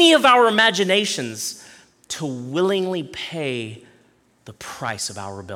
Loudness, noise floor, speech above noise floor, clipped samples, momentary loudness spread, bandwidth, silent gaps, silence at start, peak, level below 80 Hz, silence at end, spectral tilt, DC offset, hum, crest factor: -20 LUFS; -58 dBFS; 38 dB; under 0.1%; 19 LU; 16.5 kHz; none; 0 s; -4 dBFS; -64 dBFS; 0 s; -3 dB/octave; under 0.1%; none; 18 dB